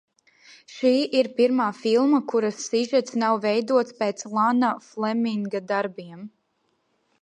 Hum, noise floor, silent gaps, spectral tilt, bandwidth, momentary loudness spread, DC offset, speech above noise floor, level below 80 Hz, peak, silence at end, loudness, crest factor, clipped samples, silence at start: none; -71 dBFS; none; -4.5 dB/octave; 10 kHz; 9 LU; under 0.1%; 48 dB; -78 dBFS; -8 dBFS; 0.95 s; -23 LUFS; 16 dB; under 0.1%; 0.7 s